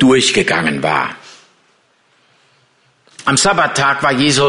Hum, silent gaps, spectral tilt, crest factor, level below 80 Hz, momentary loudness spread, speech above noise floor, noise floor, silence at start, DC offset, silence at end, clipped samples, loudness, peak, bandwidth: none; none; -3.5 dB/octave; 14 dB; -48 dBFS; 9 LU; 43 dB; -56 dBFS; 0 s; under 0.1%; 0 s; under 0.1%; -13 LUFS; -2 dBFS; 11 kHz